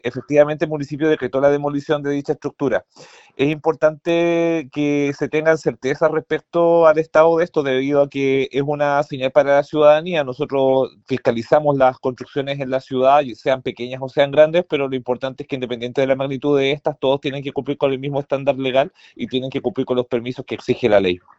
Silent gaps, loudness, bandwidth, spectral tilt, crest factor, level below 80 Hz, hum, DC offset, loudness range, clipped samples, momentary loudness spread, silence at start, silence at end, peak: none; -19 LUFS; 8 kHz; -6.5 dB/octave; 18 dB; -56 dBFS; none; under 0.1%; 4 LU; under 0.1%; 10 LU; 0.05 s; 0.2 s; 0 dBFS